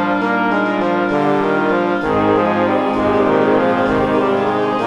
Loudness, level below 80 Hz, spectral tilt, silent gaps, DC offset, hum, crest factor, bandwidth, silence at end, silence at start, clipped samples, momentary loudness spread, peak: -15 LUFS; -44 dBFS; -7.5 dB/octave; none; under 0.1%; none; 14 dB; 10.5 kHz; 0 s; 0 s; under 0.1%; 3 LU; -2 dBFS